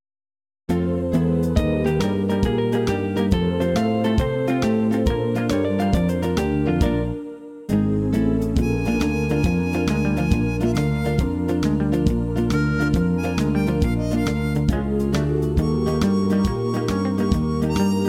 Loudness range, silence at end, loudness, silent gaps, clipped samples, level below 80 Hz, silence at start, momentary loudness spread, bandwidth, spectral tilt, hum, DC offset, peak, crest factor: 1 LU; 0 s; -21 LUFS; none; under 0.1%; -30 dBFS; 0.7 s; 2 LU; 16 kHz; -7.5 dB/octave; none; under 0.1%; -6 dBFS; 14 dB